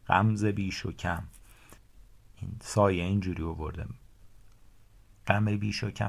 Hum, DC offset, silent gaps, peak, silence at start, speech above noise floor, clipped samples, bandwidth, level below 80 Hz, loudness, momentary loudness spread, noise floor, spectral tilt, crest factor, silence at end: none; under 0.1%; none; -6 dBFS; 0.05 s; 27 dB; under 0.1%; 14 kHz; -46 dBFS; -30 LUFS; 18 LU; -56 dBFS; -6.5 dB/octave; 24 dB; 0 s